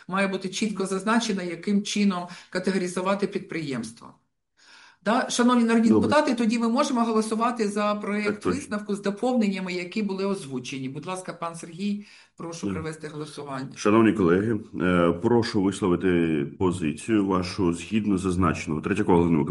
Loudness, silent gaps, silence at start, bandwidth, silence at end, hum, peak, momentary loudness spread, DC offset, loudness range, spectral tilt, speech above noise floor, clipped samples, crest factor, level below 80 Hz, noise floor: -25 LUFS; none; 0.1 s; 11.5 kHz; 0 s; none; -6 dBFS; 13 LU; under 0.1%; 7 LU; -5.5 dB/octave; 34 dB; under 0.1%; 18 dB; -56 dBFS; -59 dBFS